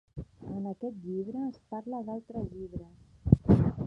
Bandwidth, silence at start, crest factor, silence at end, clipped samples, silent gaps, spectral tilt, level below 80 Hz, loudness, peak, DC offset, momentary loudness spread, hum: 5.8 kHz; 0.15 s; 26 dB; 0 s; under 0.1%; none; -11.5 dB/octave; -44 dBFS; -32 LUFS; -4 dBFS; under 0.1%; 18 LU; none